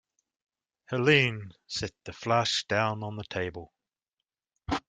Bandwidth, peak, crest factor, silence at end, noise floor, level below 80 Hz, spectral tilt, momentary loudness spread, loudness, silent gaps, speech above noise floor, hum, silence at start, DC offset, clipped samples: 9.4 kHz; -6 dBFS; 24 dB; 0.1 s; -89 dBFS; -58 dBFS; -4.5 dB/octave; 16 LU; -28 LUFS; none; 60 dB; none; 0.9 s; under 0.1%; under 0.1%